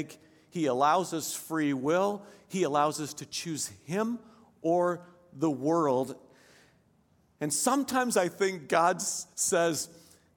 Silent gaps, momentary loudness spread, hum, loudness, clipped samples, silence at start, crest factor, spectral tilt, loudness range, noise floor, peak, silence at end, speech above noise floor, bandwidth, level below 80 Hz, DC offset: none; 12 LU; none; -29 LUFS; under 0.1%; 0 s; 20 dB; -4 dB/octave; 3 LU; -67 dBFS; -10 dBFS; 0.45 s; 38 dB; 17.5 kHz; -76 dBFS; under 0.1%